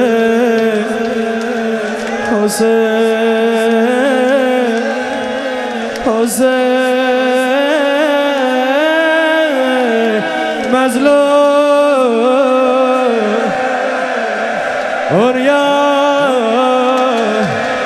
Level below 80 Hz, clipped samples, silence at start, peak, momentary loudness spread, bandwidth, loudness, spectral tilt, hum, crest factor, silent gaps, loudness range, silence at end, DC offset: -54 dBFS; under 0.1%; 0 s; 0 dBFS; 6 LU; 13.5 kHz; -12 LUFS; -4 dB/octave; none; 12 dB; none; 3 LU; 0 s; under 0.1%